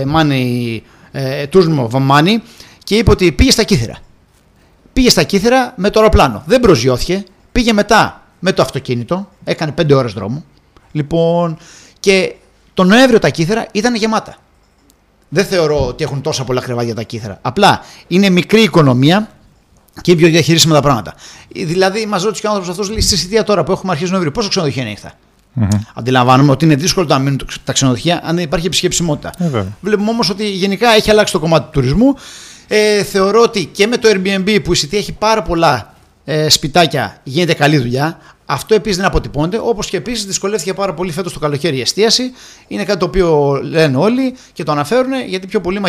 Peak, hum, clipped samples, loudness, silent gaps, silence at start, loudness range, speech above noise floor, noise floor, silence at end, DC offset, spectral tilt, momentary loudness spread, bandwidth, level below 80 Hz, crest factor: 0 dBFS; none; under 0.1%; -13 LUFS; none; 0 s; 4 LU; 38 dB; -51 dBFS; 0 s; under 0.1%; -5 dB/octave; 11 LU; 16.5 kHz; -32 dBFS; 14 dB